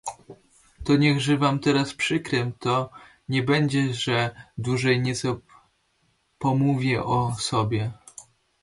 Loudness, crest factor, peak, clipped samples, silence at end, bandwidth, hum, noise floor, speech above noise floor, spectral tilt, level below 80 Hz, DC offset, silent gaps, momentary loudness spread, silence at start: -24 LUFS; 16 dB; -8 dBFS; under 0.1%; 0.4 s; 11.5 kHz; none; -68 dBFS; 45 dB; -5.5 dB/octave; -54 dBFS; under 0.1%; none; 12 LU; 0.05 s